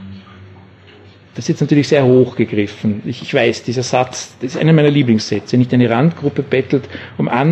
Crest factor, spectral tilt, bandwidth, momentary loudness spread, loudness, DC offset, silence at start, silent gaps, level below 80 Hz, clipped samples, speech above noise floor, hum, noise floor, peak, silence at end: 16 dB; -6.5 dB/octave; 8.6 kHz; 12 LU; -15 LUFS; under 0.1%; 0 s; none; -50 dBFS; under 0.1%; 28 dB; none; -42 dBFS; 0 dBFS; 0 s